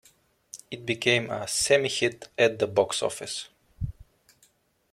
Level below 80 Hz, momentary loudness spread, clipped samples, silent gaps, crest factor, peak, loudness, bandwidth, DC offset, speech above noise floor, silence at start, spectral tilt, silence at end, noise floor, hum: -52 dBFS; 16 LU; under 0.1%; none; 22 dB; -8 dBFS; -26 LUFS; 16 kHz; under 0.1%; 39 dB; 0.55 s; -3 dB/octave; 1 s; -65 dBFS; none